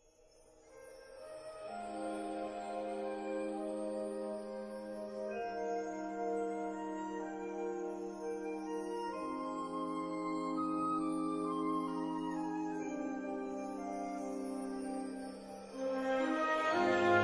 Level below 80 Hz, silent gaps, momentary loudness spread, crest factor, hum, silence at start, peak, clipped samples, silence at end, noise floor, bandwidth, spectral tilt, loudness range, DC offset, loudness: -70 dBFS; none; 10 LU; 22 dB; none; 0.35 s; -18 dBFS; under 0.1%; 0 s; -65 dBFS; 11 kHz; -5.5 dB/octave; 4 LU; under 0.1%; -39 LUFS